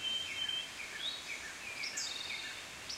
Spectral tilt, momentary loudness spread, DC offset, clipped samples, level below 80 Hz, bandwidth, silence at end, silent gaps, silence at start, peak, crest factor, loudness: 0.5 dB/octave; 7 LU; under 0.1%; under 0.1%; -70 dBFS; 16 kHz; 0 s; none; 0 s; -26 dBFS; 16 dB; -39 LUFS